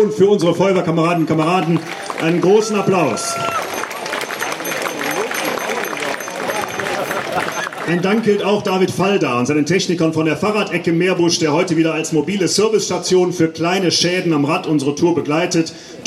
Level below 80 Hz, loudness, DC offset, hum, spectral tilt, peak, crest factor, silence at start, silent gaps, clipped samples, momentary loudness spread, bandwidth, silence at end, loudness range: -60 dBFS; -17 LUFS; under 0.1%; none; -4.5 dB/octave; -2 dBFS; 16 dB; 0 s; none; under 0.1%; 7 LU; 16 kHz; 0 s; 5 LU